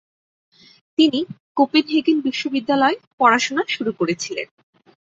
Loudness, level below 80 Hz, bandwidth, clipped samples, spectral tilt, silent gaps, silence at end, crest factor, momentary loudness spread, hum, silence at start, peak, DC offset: -19 LUFS; -68 dBFS; 8 kHz; under 0.1%; -3.5 dB/octave; 1.40-1.55 s, 3.07-3.18 s; 0.6 s; 18 dB; 11 LU; none; 1 s; -2 dBFS; under 0.1%